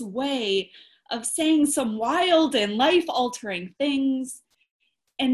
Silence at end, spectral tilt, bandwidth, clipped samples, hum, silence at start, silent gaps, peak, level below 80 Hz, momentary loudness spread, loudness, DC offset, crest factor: 0 s; -3 dB/octave; 13.5 kHz; under 0.1%; none; 0 s; 4.71-4.80 s; -8 dBFS; -66 dBFS; 13 LU; -23 LUFS; under 0.1%; 16 dB